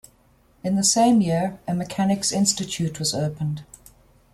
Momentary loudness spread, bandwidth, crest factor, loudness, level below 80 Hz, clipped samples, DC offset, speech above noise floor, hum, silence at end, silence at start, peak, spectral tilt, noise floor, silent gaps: 12 LU; 14.5 kHz; 18 dB; -22 LUFS; -54 dBFS; under 0.1%; under 0.1%; 36 dB; none; 0.7 s; 0.65 s; -6 dBFS; -4.5 dB/octave; -58 dBFS; none